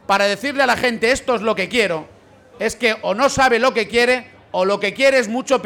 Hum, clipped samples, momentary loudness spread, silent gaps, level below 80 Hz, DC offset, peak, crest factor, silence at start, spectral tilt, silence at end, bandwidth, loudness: none; under 0.1%; 7 LU; none; -48 dBFS; under 0.1%; -6 dBFS; 12 dB; 0.1 s; -3 dB/octave; 0 s; 18 kHz; -17 LUFS